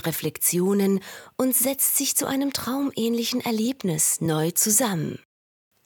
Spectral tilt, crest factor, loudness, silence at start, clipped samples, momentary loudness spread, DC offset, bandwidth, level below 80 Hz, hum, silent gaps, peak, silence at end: -3.5 dB/octave; 18 dB; -22 LUFS; 0.05 s; under 0.1%; 8 LU; under 0.1%; 19 kHz; -66 dBFS; none; none; -6 dBFS; 0.7 s